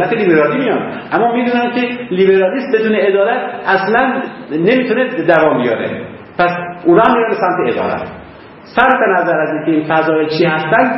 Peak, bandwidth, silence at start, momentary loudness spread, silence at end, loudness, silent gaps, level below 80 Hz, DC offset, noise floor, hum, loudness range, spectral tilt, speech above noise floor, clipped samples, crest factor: 0 dBFS; 5.8 kHz; 0 s; 8 LU; 0 s; -13 LUFS; none; -52 dBFS; under 0.1%; -35 dBFS; none; 1 LU; -8.5 dB/octave; 22 dB; under 0.1%; 14 dB